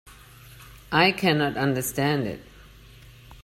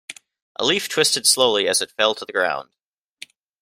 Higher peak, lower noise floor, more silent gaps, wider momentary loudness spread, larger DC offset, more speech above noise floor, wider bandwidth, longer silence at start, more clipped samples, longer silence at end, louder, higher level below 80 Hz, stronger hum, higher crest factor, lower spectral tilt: about the same, -4 dBFS vs -2 dBFS; about the same, -48 dBFS vs -45 dBFS; second, none vs 0.42-0.55 s; about the same, 10 LU vs 12 LU; neither; about the same, 25 dB vs 25 dB; about the same, 16 kHz vs 16 kHz; about the same, 0.05 s vs 0.1 s; neither; second, 0 s vs 1 s; second, -23 LUFS vs -19 LUFS; first, -52 dBFS vs -66 dBFS; first, 50 Hz at -45 dBFS vs none; about the same, 22 dB vs 20 dB; first, -4.5 dB/octave vs -1 dB/octave